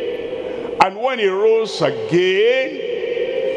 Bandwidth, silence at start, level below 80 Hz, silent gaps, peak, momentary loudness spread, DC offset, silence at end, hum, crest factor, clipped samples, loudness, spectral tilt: 10.5 kHz; 0 s; -56 dBFS; none; 0 dBFS; 11 LU; under 0.1%; 0 s; none; 18 dB; under 0.1%; -18 LUFS; -5 dB/octave